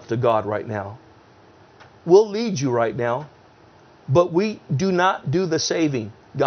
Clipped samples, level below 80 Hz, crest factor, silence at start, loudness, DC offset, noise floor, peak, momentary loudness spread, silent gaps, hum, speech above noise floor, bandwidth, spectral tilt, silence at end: under 0.1%; -60 dBFS; 20 dB; 0 s; -21 LUFS; under 0.1%; -50 dBFS; -2 dBFS; 15 LU; none; none; 30 dB; 6.8 kHz; -5.5 dB/octave; 0 s